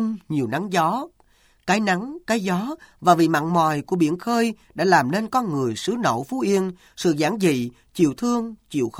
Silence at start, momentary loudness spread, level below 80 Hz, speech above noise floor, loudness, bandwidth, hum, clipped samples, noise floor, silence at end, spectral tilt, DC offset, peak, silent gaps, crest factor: 0 s; 8 LU; -60 dBFS; 37 dB; -22 LUFS; 16.5 kHz; none; under 0.1%; -58 dBFS; 0 s; -5.5 dB/octave; under 0.1%; -2 dBFS; none; 20 dB